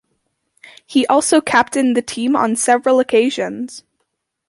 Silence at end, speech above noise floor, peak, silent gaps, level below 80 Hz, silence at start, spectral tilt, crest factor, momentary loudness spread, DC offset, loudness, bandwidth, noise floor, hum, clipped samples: 0.7 s; 57 dB; 0 dBFS; none; -60 dBFS; 0.9 s; -3 dB/octave; 16 dB; 9 LU; under 0.1%; -15 LUFS; 11.5 kHz; -72 dBFS; none; under 0.1%